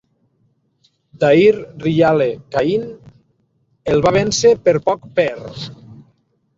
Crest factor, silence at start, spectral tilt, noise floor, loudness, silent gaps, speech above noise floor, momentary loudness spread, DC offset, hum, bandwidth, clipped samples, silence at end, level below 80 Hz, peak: 16 dB; 1.2 s; -5 dB/octave; -63 dBFS; -15 LUFS; none; 47 dB; 17 LU; under 0.1%; none; 7.8 kHz; under 0.1%; 0.65 s; -48 dBFS; -2 dBFS